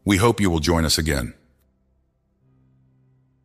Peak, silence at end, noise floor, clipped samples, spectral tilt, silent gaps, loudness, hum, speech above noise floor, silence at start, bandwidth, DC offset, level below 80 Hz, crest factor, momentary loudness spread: -4 dBFS; 2.15 s; -66 dBFS; under 0.1%; -4.5 dB/octave; none; -20 LUFS; none; 47 dB; 0.05 s; 15.5 kHz; under 0.1%; -36 dBFS; 20 dB; 8 LU